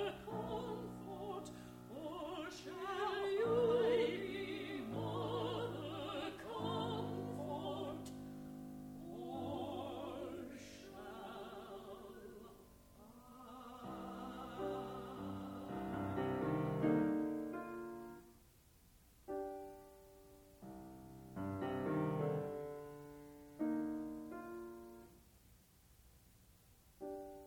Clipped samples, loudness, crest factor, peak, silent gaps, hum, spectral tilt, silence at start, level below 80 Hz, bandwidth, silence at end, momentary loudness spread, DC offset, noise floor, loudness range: under 0.1%; -43 LUFS; 20 dB; -24 dBFS; none; none; -6.5 dB/octave; 0 s; -68 dBFS; 20 kHz; 0 s; 18 LU; under 0.1%; -67 dBFS; 14 LU